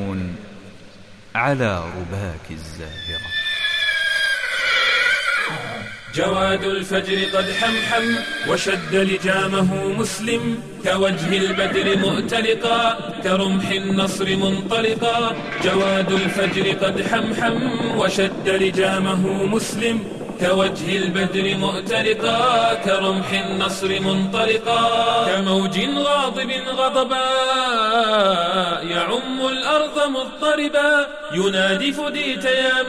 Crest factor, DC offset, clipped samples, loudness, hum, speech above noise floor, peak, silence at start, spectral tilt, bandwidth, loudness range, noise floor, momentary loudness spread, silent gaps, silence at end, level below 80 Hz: 14 dB; 0.3%; under 0.1%; -19 LUFS; none; 23 dB; -6 dBFS; 0 s; -4 dB/octave; 14 kHz; 2 LU; -43 dBFS; 6 LU; none; 0 s; -48 dBFS